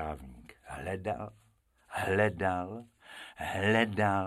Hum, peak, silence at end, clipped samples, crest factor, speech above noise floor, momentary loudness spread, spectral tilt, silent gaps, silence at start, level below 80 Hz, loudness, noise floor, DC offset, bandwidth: none; -12 dBFS; 0 s; under 0.1%; 20 dB; 35 dB; 20 LU; -6 dB/octave; none; 0 s; -56 dBFS; -32 LUFS; -66 dBFS; under 0.1%; 14.5 kHz